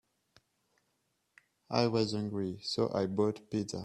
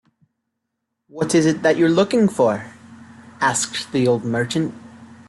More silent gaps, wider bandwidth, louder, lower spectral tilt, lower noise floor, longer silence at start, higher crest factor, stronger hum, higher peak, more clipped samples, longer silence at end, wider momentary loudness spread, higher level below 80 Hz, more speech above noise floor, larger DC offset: neither; about the same, 12 kHz vs 12.5 kHz; second, -33 LUFS vs -19 LUFS; about the same, -6 dB/octave vs -5 dB/octave; about the same, -79 dBFS vs -78 dBFS; first, 1.7 s vs 1.15 s; first, 22 dB vs 16 dB; neither; second, -12 dBFS vs -4 dBFS; neither; second, 0 s vs 0.15 s; second, 6 LU vs 10 LU; second, -70 dBFS vs -60 dBFS; second, 47 dB vs 60 dB; neither